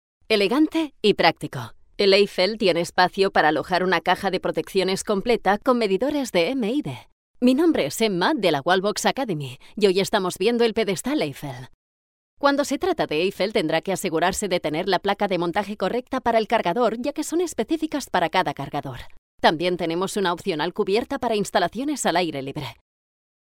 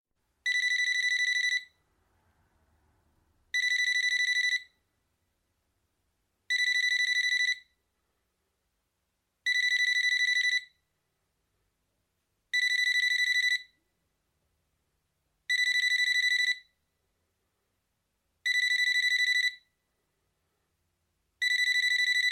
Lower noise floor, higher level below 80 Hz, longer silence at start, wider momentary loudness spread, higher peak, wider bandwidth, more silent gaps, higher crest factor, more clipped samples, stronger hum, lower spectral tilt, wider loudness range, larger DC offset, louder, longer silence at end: first, under -90 dBFS vs -80 dBFS; first, -52 dBFS vs -82 dBFS; second, 0.3 s vs 0.45 s; about the same, 9 LU vs 7 LU; first, -2 dBFS vs -16 dBFS; about the same, 16.5 kHz vs 16.5 kHz; first, 7.12-7.34 s, 11.74-12.37 s, 19.18-19.38 s vs none; first, 22 dB vs 14 dB; neither; neither; first, -4.5 dB/octave vs 6 dB/octave; first, 4 LU vs 1 LU; neither; first, -22 LUFS vs -26 LUFS; first, 0.7 s vs 0 s